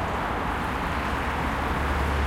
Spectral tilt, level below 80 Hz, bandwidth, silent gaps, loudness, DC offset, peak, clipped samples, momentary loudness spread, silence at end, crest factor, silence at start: -6 dB/octave; -32 dBFS; 16 kHz; none; -27 LUFS; under 0.1%; -14 dBFS; under 0.1%; 2 LU; 0 s; 12 dB; 0 s